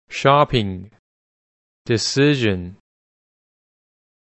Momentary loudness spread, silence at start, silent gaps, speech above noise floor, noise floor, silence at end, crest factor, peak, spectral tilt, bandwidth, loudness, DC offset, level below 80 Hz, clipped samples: 20 LU; 0.1 s; 0.99-1.85 s; over 72 dB; under -90 dBFS; 1.6 s; 20 dB; -2 dBFS; -5 dB/octave; 8.4 kHz; -18 LUFS; under 0.1%; -48 dBFS; under 0.1%